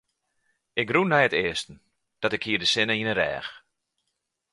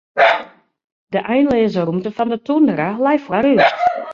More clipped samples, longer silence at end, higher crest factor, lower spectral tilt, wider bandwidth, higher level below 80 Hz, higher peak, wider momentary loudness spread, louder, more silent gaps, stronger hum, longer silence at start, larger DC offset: neither; first, 0.95 s vs 0 s; first, 22 dB vs 14 dB; second, -4 dB/octave vs -7 dB/octave; first, 11.5 kHz vs 7.2 kHz; second, -60 dBFS vs -54 dBFS; second, -6 dBFS vs -2 dBFS; first, 12 LU vs 8 LU; second, -24 LUFS vs -16 LUFS; second, none vs 0.84-1.07 s; neither; first, 0.75 s vs 0.15 s; neither